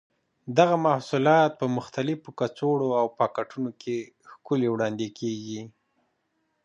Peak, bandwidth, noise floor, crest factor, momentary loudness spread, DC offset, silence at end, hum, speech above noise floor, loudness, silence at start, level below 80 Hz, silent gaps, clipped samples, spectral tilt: -4 dBFS; 9.2 kHz; -75 dBFS; 22 dB; 13 LU; under 0.1%; 0.95 s; none; 49 dB; -26 LUFS; 0.45 s; -74 dBFS; none; under 0.1%; -6.5 dB/octave